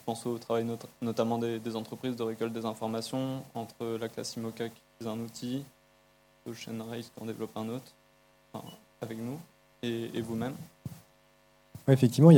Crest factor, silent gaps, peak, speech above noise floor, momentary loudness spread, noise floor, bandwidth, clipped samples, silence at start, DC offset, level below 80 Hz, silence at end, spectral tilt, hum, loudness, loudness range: 24 dB; none; -6 dBFS; 34 dB; 15 LU; -64 dBFS; 17 kHz; under 0.1%; 0.05 s; under 0.1%; -72 dBFS; 0 s; -7 dB/octave; none; -34 LUFS; 7 LU